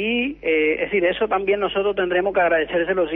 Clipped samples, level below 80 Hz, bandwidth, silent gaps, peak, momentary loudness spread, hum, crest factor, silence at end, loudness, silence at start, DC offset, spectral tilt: under 0.1%; -50 dBFS; 4 kHz; none; -8 dBFS; 3 LU; none; 12 dB; 0 s; -20 LUFS; 0 s; under 0.1%; -8 dB/octave